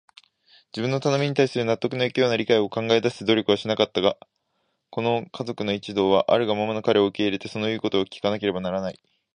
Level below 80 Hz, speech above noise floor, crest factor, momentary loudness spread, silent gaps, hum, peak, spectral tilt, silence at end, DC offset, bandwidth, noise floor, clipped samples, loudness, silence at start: -60 dBFS; 50 dB; 20 dB; 8 LU; none; none; -4 dBFS; -5.5 dB/octave; 0.4 s; under 0.1%; 10 kHz; -74 dBFS; under 0.1%; -23 LUFS; 0.75 s